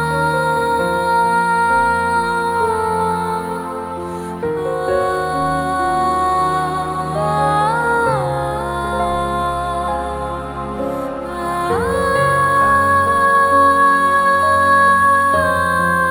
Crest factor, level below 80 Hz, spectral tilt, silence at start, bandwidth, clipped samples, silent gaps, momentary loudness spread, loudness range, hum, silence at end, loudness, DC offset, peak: 12 dB; -38 dBFS; -5 dB/octave; 0 s; 17.5 kHz; under 0.1%; none; 11 LU; 7 LU; none; 0 s; -16 LUFS; under 0.1%; -4 dBFS